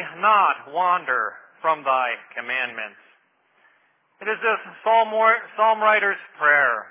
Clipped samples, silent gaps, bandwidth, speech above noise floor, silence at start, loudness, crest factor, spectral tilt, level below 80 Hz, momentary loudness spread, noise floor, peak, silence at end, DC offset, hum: under 0.1%; none; 3.8 kHz; 42 dB; 0 s; -20 LUFS; 18 dB; -5.5 dB/octave; under -90 dBFS; 11 LU; -63 dBFS; -4 dBFS; 0 s; under 0.1%; none